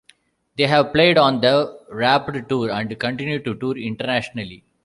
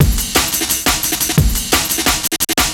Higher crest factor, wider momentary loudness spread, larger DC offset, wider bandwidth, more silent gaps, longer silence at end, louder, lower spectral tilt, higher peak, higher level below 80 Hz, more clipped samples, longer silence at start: about the same, 18 dB vs 16 dB; first, 13 LU vs 1 LU; neither; second, 11.5 kHz vs over 20 kHz; neither; first, 0.25 s vs 0 s; second, -19 LUFS vs -14 LUFS; first, -6 dB/octave vs -2.5 dB/octave; about the same, -2 dBFS vs 0 dBFS; second, -54 dBFS vs -24 dBFS; neither; first, 0.6 s vs 0 s